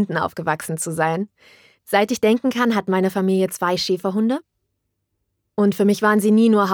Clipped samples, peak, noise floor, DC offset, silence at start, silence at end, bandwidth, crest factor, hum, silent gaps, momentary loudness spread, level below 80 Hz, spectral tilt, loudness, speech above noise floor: under 0.1%; 0 dBFS; -74 dBFS; under 0.1%; 0 s; 0 s; 19.5 kHz; 18 dB; none; none; 9 LU; -64 dBFS; -5.5 dB/octave; -19 LUFS; 56 dB